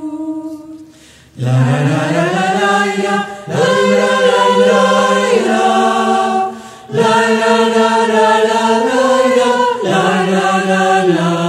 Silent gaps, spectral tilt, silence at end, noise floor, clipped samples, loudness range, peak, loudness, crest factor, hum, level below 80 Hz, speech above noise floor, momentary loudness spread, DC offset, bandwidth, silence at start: none; -5 dB/octave; 0 s; -42 dBFS; under 0.1%; 3 LU; 0 dBFS; -12 LUFS; 12 dB; none; -58 dBFS; 30 dB; 9 LU; under 0.1%; 15 kHz; 0 s